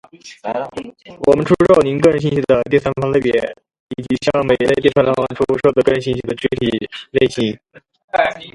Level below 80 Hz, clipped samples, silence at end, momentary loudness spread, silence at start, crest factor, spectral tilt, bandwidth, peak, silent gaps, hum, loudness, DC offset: -44 dBFS; under 0.1%; 0.05 s; 13 LU; 0.25 s; 16 dB; -6.5 dB/octave; 11.5 kHz; 0 dBFS; 3.80-3.87 s, 8.04-8.08 s; none; -16 LUFS; under 0.1%